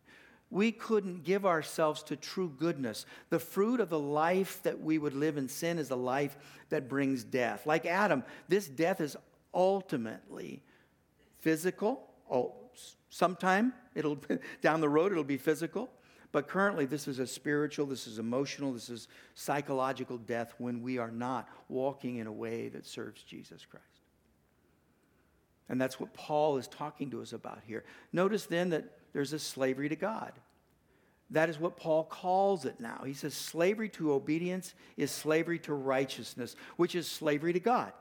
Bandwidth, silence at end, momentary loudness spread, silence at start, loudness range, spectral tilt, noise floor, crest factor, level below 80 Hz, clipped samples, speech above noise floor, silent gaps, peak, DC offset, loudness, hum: 19 kHz; 0 s; 13 LU; 0.1 s; 6 LU; -5.5 dB/octave; -70 dBFS; 22 dB; -78 dBFS; under 0.1%; 37 dB; none; -12 dBFS; under 0.1%; -34 LUFS; none